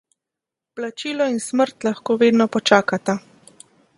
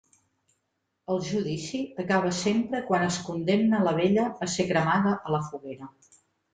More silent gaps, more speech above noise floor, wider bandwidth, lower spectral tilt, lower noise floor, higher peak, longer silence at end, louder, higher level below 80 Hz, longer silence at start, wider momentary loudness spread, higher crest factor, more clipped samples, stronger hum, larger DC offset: neither; first, 67 dB vs 52 dB; first, 11.5 kHz vs 9.4 kHz; about the same, -4.5 dB/octave vs -5.5 dB/octave; first, -86 dBFS vs -79 dBFS; first, 0 dBFS vs -12 dBFS; first, 0.8 s vs 0.65 s; first, -19 LUFS vs -26 LUFS; about the same, -68 dBFS vs -64 dBFS; second, 0.75 s vs 1.1 s; about the same, 13 LU vs 13 LU; about the same, 20 dB vs 16 dB; neither; neither; neither